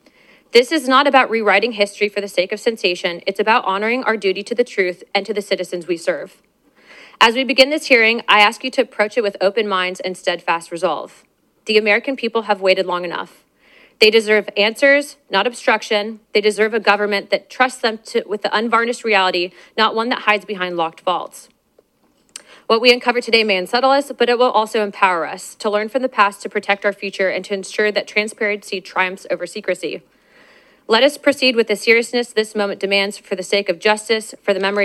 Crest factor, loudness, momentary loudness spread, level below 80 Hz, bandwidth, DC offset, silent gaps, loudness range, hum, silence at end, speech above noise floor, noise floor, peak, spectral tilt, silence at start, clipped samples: 18 dB; -17 LUFS; 10 LU; -68 dBFS; 14 kHz; under 0.1%; none; 5 LU; none; 0 s; 42 dB; -59 dBFS; 0 dBFS; -3 dB/octave; 0.55 s; under 0.1%